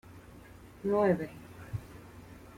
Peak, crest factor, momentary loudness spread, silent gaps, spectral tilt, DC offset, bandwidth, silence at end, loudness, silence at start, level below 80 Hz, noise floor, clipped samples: -16 dBFS; 20 dB; 25 LU; none; -8 dB/octave; under 0.1%; 16.5 kHz; 0 s; -33 LUFS; 0.1 s; -58 dBFS; -52 dBFS; under 0.1%